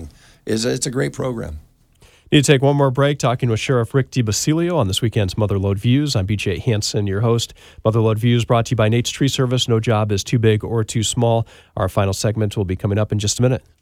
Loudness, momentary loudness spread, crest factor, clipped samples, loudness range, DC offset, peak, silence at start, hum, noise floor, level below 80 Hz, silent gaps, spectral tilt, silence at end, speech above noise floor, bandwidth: -18 LUFS; 6 LU; 18 dB; under 0.1%; 2 LU; under 0.1%; 0 dBFS; 0 s; none; -51 dBFS; -44 dBFS; none; -5.5 dB/octave; 0.25 s; 34 dB; 15.5 kHz